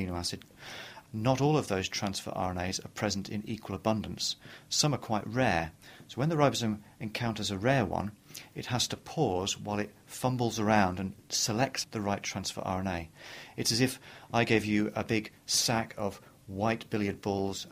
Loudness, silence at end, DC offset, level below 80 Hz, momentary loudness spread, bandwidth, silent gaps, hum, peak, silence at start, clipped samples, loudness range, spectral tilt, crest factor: -31 LUFS; 0 s; under 0.1%; -58 dBFS; 14 LU; 15.5 kHz; none; none; -10 dBFS; 0 s; under 0.1%; 2 LU; -4 dB/octave; 22 dB